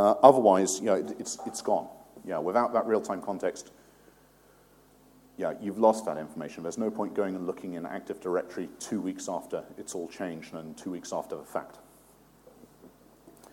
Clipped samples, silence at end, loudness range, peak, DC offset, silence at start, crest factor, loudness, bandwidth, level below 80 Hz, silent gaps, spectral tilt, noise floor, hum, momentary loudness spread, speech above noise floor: under 0.1%; 0.25 s; 9 LU; -2 dBFS; under 0.1%; 0 s; 28 dB; -29 LUFS; 17 kHz; -70 dBFS; none; -5 dB/octave; -60 dBFS; none; 14 LU; 31 dB